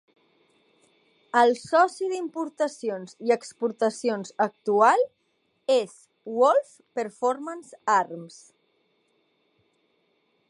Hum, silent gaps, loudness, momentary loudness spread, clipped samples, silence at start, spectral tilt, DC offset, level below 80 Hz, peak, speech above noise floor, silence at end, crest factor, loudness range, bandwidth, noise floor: none; none; -25 LUFS; 14 LU; under 0.1%; 1.35 s; -4 dB/octave; under 0.1%; -82 dBFS; -6 dBFS; 47 dB; 2.2 s; 20 dB; 6 LU; 11.5 kHz; -71 dBFS